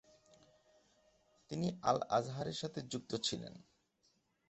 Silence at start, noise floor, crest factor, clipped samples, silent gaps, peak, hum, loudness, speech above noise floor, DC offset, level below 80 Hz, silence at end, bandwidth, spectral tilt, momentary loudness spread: 1.5 s; -77 dBFS; 24 dB; under 0.1%; none; -18 dBFS; none; -39 LUFS; 39 dB; under 0.1%; -72 dBFS; 0.9 s; 8.2 kHz; -5 dB/octave; 11 LU